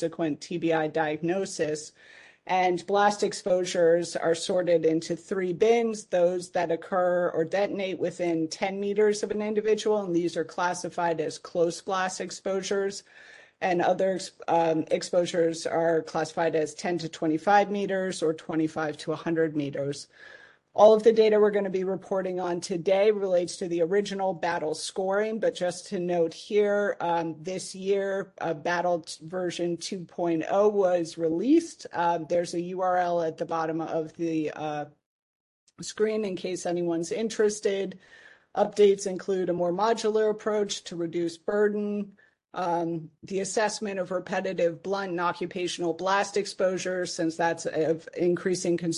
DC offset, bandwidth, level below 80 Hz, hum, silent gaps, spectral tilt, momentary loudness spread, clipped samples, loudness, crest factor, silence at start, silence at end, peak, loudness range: under 0.1%; 11.5 kHz; -72 dBFS; none; 35.06-35.67 s; -5 dB/octave; 9 LU; under 0.1%; -27 LUFS; 22 dB; 0 s; 0 s; -6 dBFS; 6 LU